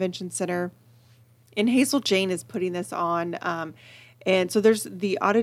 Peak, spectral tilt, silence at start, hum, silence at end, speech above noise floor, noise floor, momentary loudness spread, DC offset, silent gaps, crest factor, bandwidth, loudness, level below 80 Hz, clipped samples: -6 dBFS; -4.5 dB/octave; 0 s; none; 0 s; 32 dB; -56 dBFS; 11 LU; under 0.1%; none; 18 dB; 16 kHz; -25 LUFS; -74 dBFS; under 0.1%